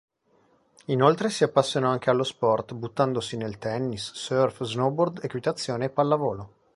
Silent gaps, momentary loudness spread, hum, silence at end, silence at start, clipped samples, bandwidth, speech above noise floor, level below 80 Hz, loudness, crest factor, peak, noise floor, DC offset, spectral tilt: none; 9 LU; none; 0.3 s; 0.9 s; under 0.1%; 11.5 kHz; 39 dB; -62 dBFS; -26 LUFS; 22 dB; -4 dBFS; -64 dBFS; under 0.1%; -5.5 dB/octave